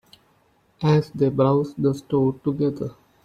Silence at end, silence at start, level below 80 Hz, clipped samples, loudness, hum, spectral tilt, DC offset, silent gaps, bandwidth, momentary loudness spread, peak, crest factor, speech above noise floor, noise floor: 0.35 s; 0.8 s; -56 dBFS; under 0.1%; -22 LUFS; none; -9 dB/octave; under 0.1%; none; 9.2 kHz; 6 LU; -6 dBFS; 16 dB; 41 dB; -62 dBFS